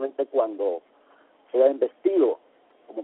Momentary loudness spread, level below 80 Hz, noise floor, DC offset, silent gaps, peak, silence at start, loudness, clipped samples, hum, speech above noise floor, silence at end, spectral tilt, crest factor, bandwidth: 14 LU; -78 dBFS; -59 dBFS; under 0.1%; none; -8 dBFS; 0 s; -24 LUFS; under 0.1%; none; 36 dB; 0 s; -4 dB/octave; 18 dB; 4 kHz